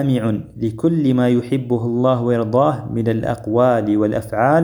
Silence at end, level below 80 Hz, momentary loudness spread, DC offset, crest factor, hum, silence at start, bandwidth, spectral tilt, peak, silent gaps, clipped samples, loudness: 0 s; -48 dBFS; 6 LU; under 0.1%; 16 dB; none; 0 s; 20 kHz; -8.5 dB/octave; -2 dBFS; none; under 0.1%; -18 LUFS